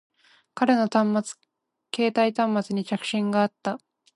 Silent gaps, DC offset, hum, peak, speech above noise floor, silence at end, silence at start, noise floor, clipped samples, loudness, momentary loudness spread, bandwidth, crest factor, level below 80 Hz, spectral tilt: none; under 0.1%; none; -8 dBFS; 19 dB; 0.4 s; 0.55 s; -43 dBFS; under 0.1%; -24 LUFS; 15 LU; 11.5 kHz; 18 dB; -76 dBFS; -5.5 dB/octave